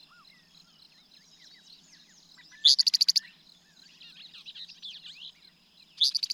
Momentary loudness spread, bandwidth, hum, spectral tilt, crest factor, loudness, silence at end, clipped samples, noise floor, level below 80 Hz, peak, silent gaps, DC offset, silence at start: 26 LU; 17 kHz; none; 3.5 dB/octave; 24 dB; -22 LUFS; 0 s; under 0.1%; -59 dBFS; -82 dBFS; -8 dBFS; none; under 0.1%; 2.65 s